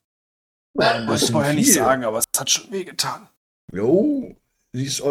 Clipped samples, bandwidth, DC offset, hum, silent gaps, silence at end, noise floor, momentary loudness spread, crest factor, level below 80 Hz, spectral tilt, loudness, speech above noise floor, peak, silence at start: under 0.1%; 16.5 kHz; under 0.1%; none; 3.37-3.68 s; 0 s; under -90 dBFS; 15 LU; 22 dB; -56 dBFS; -3.5 dB/octave; -19 LUFS; over 70 dB; 0 dBFS; 0.75 s